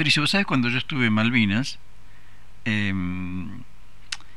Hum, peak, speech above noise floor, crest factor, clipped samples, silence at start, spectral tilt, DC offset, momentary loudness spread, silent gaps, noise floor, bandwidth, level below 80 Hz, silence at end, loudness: 50 Hz at -45 dBFS; -4 dBFS; 28 dB; 20 dB; under 0.1%; 0 s; -5 dB/octave; 2%; 16 LU; none; -51 dBFS; 12.5 kHz; -52 dBFS; 0.2 s; -23 LUFS